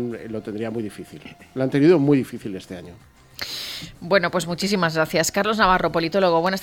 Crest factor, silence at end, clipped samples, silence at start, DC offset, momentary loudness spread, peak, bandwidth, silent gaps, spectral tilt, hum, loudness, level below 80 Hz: 18 dB; 0 s; under 0.1%; 0 s; under 0.1%; 17 LU; -4 dBFS; 18 kHz; none; -5 dB/octave; none; -21 LUFS; -48 dBFS